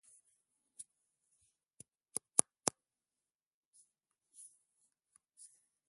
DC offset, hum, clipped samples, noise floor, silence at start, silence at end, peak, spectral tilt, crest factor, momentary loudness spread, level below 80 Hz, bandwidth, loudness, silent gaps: under 0.1%; none; under 0.1%; under -90 dBFS; 0.8 s; 3.2 s; -4 dBFS; -1 dB/octave; 44 dB; 28 LU; -84 dBFS; 11.5 kHz; -36 LUFS; none